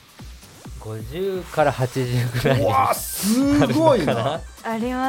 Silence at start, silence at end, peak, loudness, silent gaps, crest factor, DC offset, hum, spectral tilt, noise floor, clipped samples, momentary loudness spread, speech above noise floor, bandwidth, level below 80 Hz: 0.2 s; 0 s; -2 dBFS; -20 LUFS; none; 18 dB; under 0.1%; none; -5.5 dB/octave; -41 dBFS; under 0.1%; 17 LU; 21 dB; 17 kHz; -42 dBFS